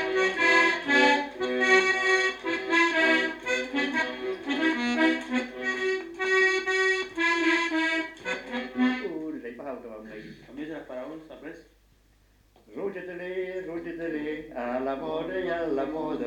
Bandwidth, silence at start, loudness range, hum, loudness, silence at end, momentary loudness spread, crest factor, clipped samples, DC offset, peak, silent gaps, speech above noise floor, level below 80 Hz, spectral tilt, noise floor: 11.5 kHz; 0 s; 16 LU; none; -25 LUFS; 0 s; 18 LU; 18 dB; under 0.1%; under 0.1%; -8 dBFS; none; 29 dB; -62 dBFS; -3 dB/octave; -61 dBFS